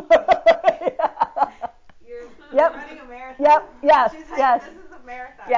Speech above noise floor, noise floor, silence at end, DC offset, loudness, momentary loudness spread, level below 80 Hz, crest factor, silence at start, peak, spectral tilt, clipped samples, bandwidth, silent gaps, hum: 24 dB; -41 dBFS; 0 s; under 0.1%; -18 LUFS; 21 LU; -54 dBFS; 14 dB; 0 s; -6 dBFS; -4 dB/octave; under 0.1%; 7.6 kHz; none; none